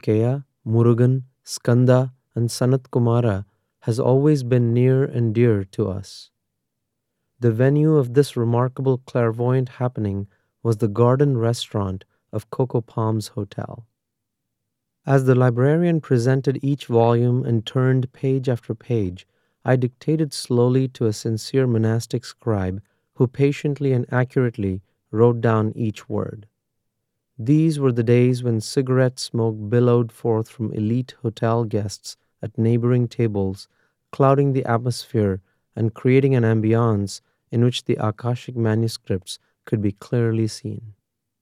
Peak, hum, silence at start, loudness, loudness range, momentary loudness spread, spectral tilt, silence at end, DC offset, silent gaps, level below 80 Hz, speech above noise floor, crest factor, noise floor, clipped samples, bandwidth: -4 dBFS; none; 0.05 s; -21 LUFS; 3 LU; 12 LU; -7.5 dB/octave; 0.5 s; under 0.1%; none; -62 dBFS; 61 dB; 18 dB; -80 dBFS; under 0.1%; 12.5 kHz